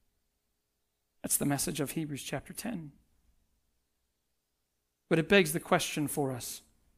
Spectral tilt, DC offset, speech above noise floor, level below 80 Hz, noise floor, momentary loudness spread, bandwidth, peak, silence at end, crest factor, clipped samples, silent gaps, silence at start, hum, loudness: -4 dB/octave; under 0.1%; 50 dB; -62 dBFS; -81 dBFS; 15 LU; 16 kHz; -10 dBFS; 0.4 s; 26 dB; under 0.1%; none; 1.25 s; none; -31 LUFS